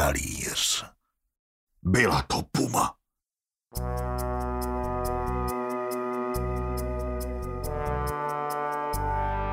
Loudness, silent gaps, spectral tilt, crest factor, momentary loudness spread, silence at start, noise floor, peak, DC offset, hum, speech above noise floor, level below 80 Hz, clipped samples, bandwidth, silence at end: -29 LUFS; 1.39-1.67 s; -4 dB/octave; 20 dB; 9 LU; 0 s; under -90 dBFS; -8 dBFS; under 0.1%; none; over 64 dB; -38 dBFS; under 0.1%; 16 kHz; 0 s